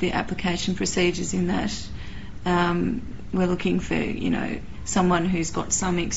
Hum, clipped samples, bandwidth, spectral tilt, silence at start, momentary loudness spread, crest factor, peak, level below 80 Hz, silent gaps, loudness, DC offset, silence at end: none; under 0.1%; 8 kHz; -5 dB/octave; 0 s; 10 LU; 18 dB; -8 dBFS; -40 dBFS; none; -25 LUFS; 2%; 0 s